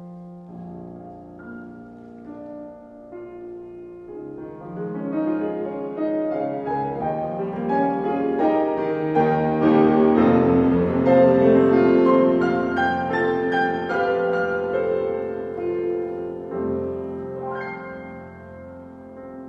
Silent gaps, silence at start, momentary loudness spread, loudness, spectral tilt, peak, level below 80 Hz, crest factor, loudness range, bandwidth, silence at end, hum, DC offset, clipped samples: none; 0 s; 23 LU; -21 LUFS; -9 dB/octave; -4 dBFS; -54 dBFS; 18 dB; 21 LU; 6.2 kHz; 0 s; none; under 0.1%; under 0.1%